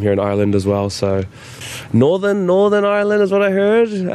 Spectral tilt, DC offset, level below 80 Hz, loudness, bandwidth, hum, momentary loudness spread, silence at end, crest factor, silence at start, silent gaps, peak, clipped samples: -6.5 dB/octave; under 0.1%; -52 dBFS; -15 LUFS; 13 kHz; none; 11 LU; 0 s; 12 dB; 0 s; none; -2 dBFS; under 0.1%